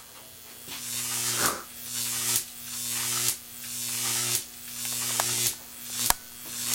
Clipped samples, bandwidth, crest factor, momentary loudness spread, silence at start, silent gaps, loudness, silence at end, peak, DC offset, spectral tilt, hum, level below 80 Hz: under 0.1%; 16.5 kHz; 30 dB; 12 LU; 0 s; none; -28 LUFS; 0 s; 0 dBFS; under 0.1%; 0 dB/octave; none; -58 dBFS